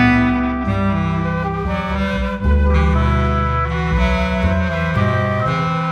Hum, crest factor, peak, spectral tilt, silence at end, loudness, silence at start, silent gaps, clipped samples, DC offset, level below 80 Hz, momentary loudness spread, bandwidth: none; 14 dB; -2 dBFS; -8 dB/octave; 0 s; -18 LUFS; 0 s; none; under 0.1%; under 0.1%; -22 dBFS; 5 LU; 7 kHz